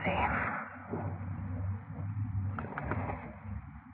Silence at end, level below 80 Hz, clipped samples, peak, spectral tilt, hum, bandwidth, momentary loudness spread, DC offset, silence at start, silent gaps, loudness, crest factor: 0 s; -50 dBFS; under 0.1%; -16 dBFS; -6 dB/octave; none; 3.9 kHz; 12 LU; under 0.1%; 0 s; none; -37 LUFS; 20 dB